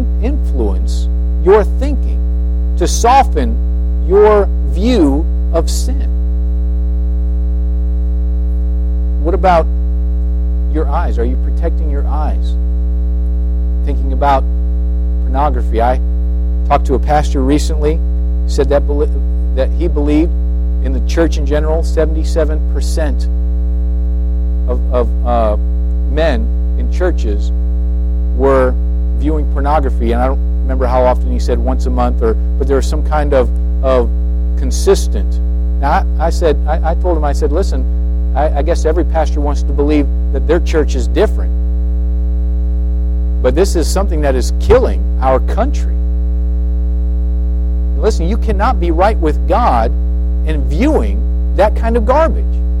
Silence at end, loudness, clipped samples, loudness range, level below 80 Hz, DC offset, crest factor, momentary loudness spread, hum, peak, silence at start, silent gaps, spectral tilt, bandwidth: 0 s; -14 LUFS; under 0.1%; 3 LU; -14 dBFS; under 0.1%; 12 dB; 5 LU; 60 Hz at -15 dBFS; 0 dBFS; 0 s; none; -7 dB/octave; 11 kHz